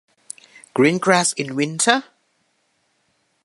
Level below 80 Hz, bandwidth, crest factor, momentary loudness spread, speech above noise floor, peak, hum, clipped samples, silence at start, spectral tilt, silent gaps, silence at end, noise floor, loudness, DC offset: -70 dBFS; 11.5 kHz; 22 dB; 21 LU; 49 dB; 0 dBFS; none; under 0.1%; 0.75 s; -3.5 dB/octave; none; 1.4 s; -67 dBFS; -18 LUFS; under 0.1%